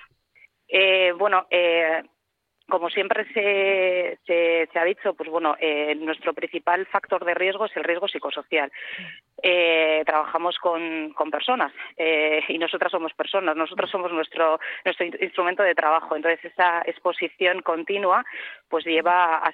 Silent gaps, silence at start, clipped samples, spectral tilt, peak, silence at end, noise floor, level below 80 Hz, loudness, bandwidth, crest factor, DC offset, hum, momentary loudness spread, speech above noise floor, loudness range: none; 0.7 s; under 0.1%; -6 dB/octave; -6 dBFS; 0 s; -72 dBFS; -78 dBFS; -23 LUFS; 4.7 kHz; 18 dB; under 0.1%; none; 8 LU; 49 dB; 2 LU